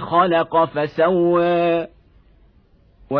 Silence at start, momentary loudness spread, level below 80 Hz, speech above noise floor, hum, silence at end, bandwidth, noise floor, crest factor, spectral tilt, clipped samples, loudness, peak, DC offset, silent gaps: 0 s; 5 LU; -54 dBFS; 37 dB; none; 0 s; 5.4 kHz; -54 dBFS; 16 dB; -9.5 dB/octave; under 0.1%; -18 LUFS; -4 dBFS; under 0.1%; none